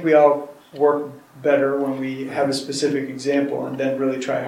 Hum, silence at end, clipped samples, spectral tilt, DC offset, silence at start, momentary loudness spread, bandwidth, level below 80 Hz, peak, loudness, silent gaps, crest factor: none; 0 s; under 0.1%; -5 dB/octave; under 0.1%; 0 s; 8 LU; 15.5 kHz; -72 dBFS; -2 dBFS; -21 LUFS; none; 18 dB